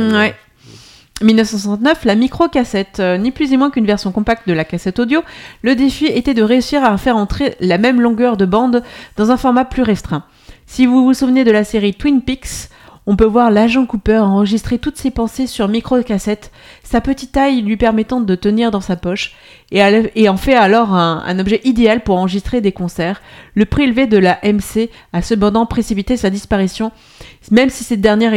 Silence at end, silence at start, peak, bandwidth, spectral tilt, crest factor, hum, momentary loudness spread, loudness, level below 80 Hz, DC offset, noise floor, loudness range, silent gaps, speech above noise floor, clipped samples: 0 s; 0 s; 0 dBFS; 15.5 kHz; -6 dB/octave; 14 dB; none; 8 LU; -14 LUFS; -34 dBFS; under 0.1%; -41 dBFS; 3 LU; none; 28 dB; under 0.1%